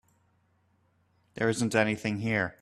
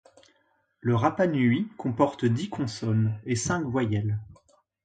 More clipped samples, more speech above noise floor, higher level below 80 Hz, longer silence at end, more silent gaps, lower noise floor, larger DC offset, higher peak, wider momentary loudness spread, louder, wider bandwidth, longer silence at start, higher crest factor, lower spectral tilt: neither; about the same, 41 dB vs 44 dB; second, -66 dBFS vs -56 dBFS; second, 0.1 s vs 0.55 s; neither; about the same, -69 dBFS vs -70 dBFS; neither; second, -10 dBFS vs -6 dBFS; second, 5 LU vs 8 LU; about the same, -28 LUFS vs -27 LUFS; first, 13.5 kHz vs 9.4 kHz; first, 1.35 s vs 0.85 s; about the same, 22 dB vs 20 dB; about the same, -5.5 dB/octave vs -6.5 dB/octave